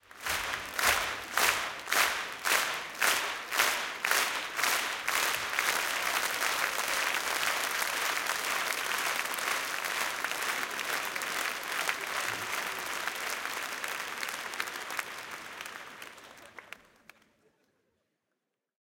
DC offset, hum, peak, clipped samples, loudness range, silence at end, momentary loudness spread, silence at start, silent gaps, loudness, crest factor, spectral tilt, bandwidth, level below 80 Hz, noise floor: under 0.1%; none; -8 dBFS; under 0.1%; 11 LU; 2.05 s; 13 LU; 0.1 s; none; -30 LUFS; 26 dB; 0.5 dB/octave; 17 kHz; -66 dBFS; -85 dBFS